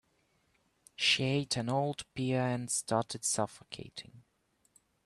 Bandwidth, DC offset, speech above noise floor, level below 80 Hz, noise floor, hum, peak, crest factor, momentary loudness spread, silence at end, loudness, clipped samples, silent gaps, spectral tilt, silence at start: 13 kHz; under 0.1%; 40 dB; -70 dBFS; -75 dBFS; none; -16 dBFS; 20 dB; 18 LU; 0.85 s; -32 LUFS; under 0.1%; none; -3.5 dB/octave; 1 s